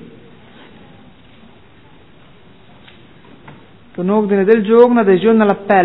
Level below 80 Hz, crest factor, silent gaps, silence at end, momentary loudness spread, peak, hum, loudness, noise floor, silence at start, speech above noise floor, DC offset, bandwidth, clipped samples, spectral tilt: -58 dBFS; 16 dB; none; 0 s; 9 LU; 0 dBFS; none; -12 LUFS; -45 dBFS; 3.45 s; 34 dB; 0.5%; 4.1 kHz; under 0.1%; -10.5 dB/octave